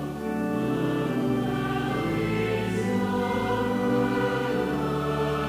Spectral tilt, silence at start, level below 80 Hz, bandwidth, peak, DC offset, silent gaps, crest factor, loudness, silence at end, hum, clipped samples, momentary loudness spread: -7 dB/octave; 0 s; -48 dBFS; 16 kHz; -14 dBFS; under 0.1%; none; 12 dB; -26 LUFS; 0 s; none; under 0.1%; 2 LU